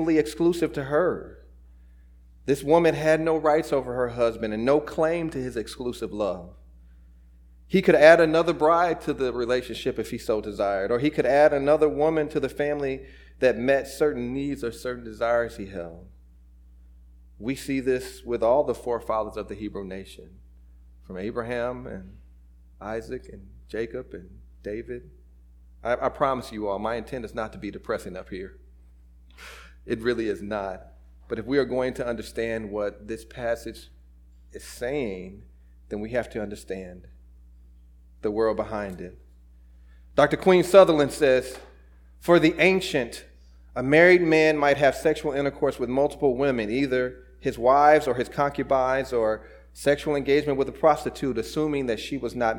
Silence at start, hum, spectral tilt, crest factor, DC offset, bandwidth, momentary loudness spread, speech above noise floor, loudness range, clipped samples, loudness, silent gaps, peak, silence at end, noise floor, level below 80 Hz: 0 s; none; -6 dB/octave; 24 dB; under 0.1%; 18 kHz; 18 LU; 27 dB; 13 LU; under 0.1%; -24 LUFS; none; -2 dBFS; 0 s; -51 dBFS; -48 dBFS